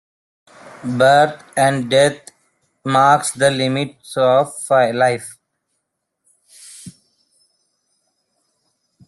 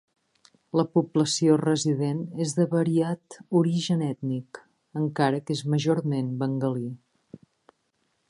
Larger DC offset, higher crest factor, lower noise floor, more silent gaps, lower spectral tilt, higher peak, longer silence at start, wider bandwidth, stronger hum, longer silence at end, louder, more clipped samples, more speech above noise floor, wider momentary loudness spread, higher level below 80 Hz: neither; about the same, 18 dB vs 18 dB; about the same, -75 dBFS vs -73 dBFS; neither; second, -4.5 dB/octave vs -6 dB/octave; first, 0 dBFS vs -8 dBFS; about the same, 0.65 s vs 0.75 s; about the same, 12.5 kHz vs 11.5 kHz; neither; first, 2.2 s vs 1.35 s; first, -16 LUFS vs -26 LUFS; neither; first, 59 dB vs 48 dB; first, 23 LU vs 10 LU; first, -60 dBFS vs -72 dBFS